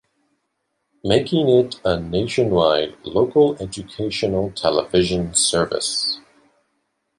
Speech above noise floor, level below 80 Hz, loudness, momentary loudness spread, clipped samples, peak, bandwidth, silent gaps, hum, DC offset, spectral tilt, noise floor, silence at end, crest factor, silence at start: 54 dB; -46 dBFS; -19 LUFS; 8 LU; under 0.1%; -2 dBFS; 11.5 kHz; none; none; under 0.1%; -4 dB/octave; -73 dBFS; 1 s; 18 dB; 1.05 s